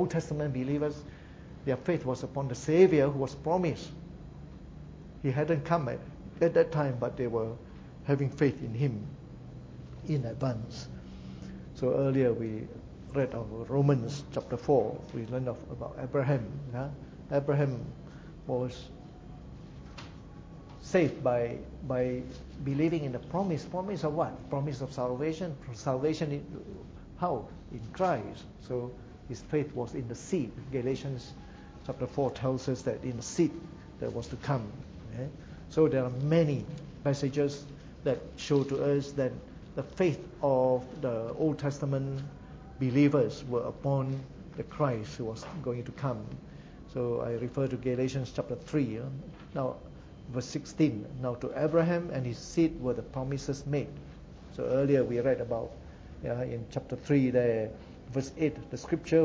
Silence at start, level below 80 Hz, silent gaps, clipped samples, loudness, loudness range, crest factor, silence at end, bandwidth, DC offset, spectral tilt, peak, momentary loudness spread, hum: 0 s; -54 dBFS; none; under 0.1%; -32 LUFS; 5 LU; 22 dB; 0 s; 8 kHz; under 0.1%; -7.5 dB/octave; -10 dBFS; 19 LU; none